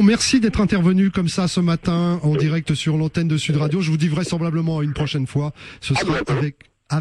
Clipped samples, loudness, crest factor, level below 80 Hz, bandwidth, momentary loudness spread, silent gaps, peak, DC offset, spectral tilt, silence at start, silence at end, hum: under 0.1%; -20 LUFS; 14 dB; -40 dBFS; 11.5 kHz; 6 LU; none; -6 dBFS; under 0.1%; -6 dB/octave; 0 s; 0 s; none